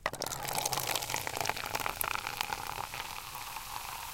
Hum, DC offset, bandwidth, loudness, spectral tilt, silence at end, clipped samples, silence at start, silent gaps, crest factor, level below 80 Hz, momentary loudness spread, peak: none; under 0.1%; 17 kHz; -35 LUFS; -1 dB/octave; 0 s; under 0.1%; 0 s; none; 30 dB; -56 dBFS; 8 LU; -8 dBFS